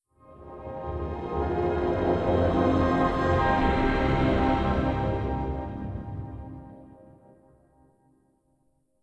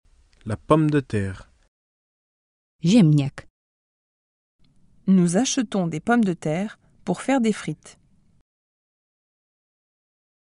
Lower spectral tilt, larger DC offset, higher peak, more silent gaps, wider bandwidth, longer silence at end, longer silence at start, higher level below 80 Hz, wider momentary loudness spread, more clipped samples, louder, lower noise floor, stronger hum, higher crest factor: first, -8.5 dB/octave vs -6 dB/octave; neither; second, -12 dBFS vs -4 dBFS; second, none vs 1.68-2.79 s, 3.50-4.59 s; second, 9 kHz vs 11 kHz; second, 2.1 s vs 2.6 s; second, 0.3 s vs 0.45 s; first, -36 dBFS vs -56 dBFS; about the same, 16 LU vs 15 LU; neither; second, -26 LUFS vs -22 LUFS; second, -69 dBFS vs under -90 dBFS; neither; about the same, 16 dB vs 20 dB